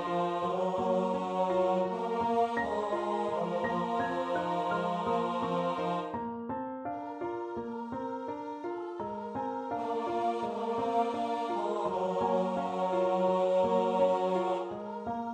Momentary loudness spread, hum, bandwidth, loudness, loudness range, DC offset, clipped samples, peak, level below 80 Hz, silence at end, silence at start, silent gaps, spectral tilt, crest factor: 10 LU; none; 9.2 kHz; -32 LUFS; 7 LU; under 0.1%; under 0.1%; -16 dBFS; -68 dBFS; 0 s; 0 s; none; -7 dB/octave; 16 dB